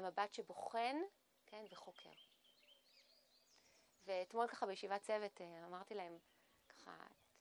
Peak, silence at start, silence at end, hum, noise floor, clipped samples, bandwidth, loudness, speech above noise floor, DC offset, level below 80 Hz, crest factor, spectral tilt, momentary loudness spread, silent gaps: -28 dBFS; 0 s; 0.3 s; none; -74 dBFS; under 0.1%; over 20 kHz; -46 LUFS; 27 dB; under 0.1%; under -90 dBFS; 22 dB; -3.5 dB/octave; 20 LU; none